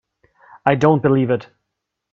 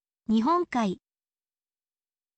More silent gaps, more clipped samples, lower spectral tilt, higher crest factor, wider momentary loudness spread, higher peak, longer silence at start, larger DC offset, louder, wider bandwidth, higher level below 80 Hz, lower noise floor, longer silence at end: neither; neither; first, -8.5 dB/octave vs -6.5 dB/octave; about the same, 20 dB vs 16 dB; about the same, 7 LU vs 8 LU; first, 0 dBFS vs -14 dBFS; first, 0.65 s vs 0.3 s; neither; first, -17 LUFS vs -26 LUFS; second, 7.6 kHz vs 8.4 kHz; first, -56 dBFS vs -66 dBFS; second, -79 dBFS vs under -90 dBFS; second, 0.7 s vs 1.4 s